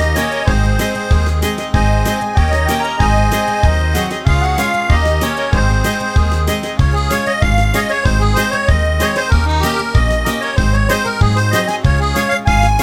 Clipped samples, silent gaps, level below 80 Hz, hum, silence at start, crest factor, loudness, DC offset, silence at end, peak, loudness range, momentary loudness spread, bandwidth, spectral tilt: under 0.1%; none; -18 dBFS; none; 0 s; 14 dB; -15 LUFS; 0.3%; 0 s; 0 dBFS; 1 LU; 2 LU; 17.5 kHz; -5.5 dB/octave